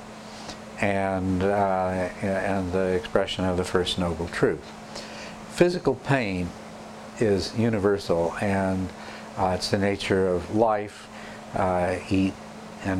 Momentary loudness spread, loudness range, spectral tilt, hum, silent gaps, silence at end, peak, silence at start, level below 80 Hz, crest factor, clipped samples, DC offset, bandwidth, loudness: 15 LU; 2 LU; -6 dB/octave; none; none; 0 s; -6 dBFS; 0 s; -50 dBFS; 20 dB; under 0.1%; under 0.1%; 13.5 kHz; -25 LUFS